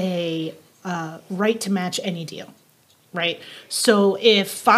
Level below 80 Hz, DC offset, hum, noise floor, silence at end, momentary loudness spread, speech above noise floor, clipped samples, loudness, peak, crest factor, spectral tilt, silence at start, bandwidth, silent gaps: -82 dBFS; under 0.1%; none; -57 dBFS; 0 s; 17 LU; 37 dB; under 0.1%; -21 LUFS; 0 dBFS; 22 dB; -4 dB/octave; 0 s; 16 kHz; none